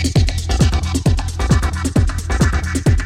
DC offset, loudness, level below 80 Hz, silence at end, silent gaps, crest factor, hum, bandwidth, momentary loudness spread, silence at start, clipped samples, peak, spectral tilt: under 0.1%; -17 LUFS; -20 dBFS; 0 s; none; 14 dB; none; 15 kHz; 2 LU; 0 s; under 0.1%; -2 dBFS; -5.5 dB/octave